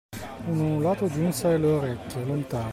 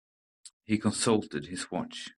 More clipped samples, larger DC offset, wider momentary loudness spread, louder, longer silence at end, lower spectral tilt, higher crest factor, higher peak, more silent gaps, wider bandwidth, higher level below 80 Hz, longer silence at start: neither; neither; about the same, 9 LU vs 10 LU; first, -26 LUFS vs -30 LUFS; about the same, 0 s vs 0.05 s; first, -7 dB/octave vs -4.5 dB/octave; second, 12 dB vs 20 dB; about the same, -14 dBFS vs -12 dBFS; second, none vs 0.53-0.60 s; first, 16 kHz vs 12.5 kHz; first, -52 dBFS vs -66 dBFS; second, 0.1 s vs 0.45 s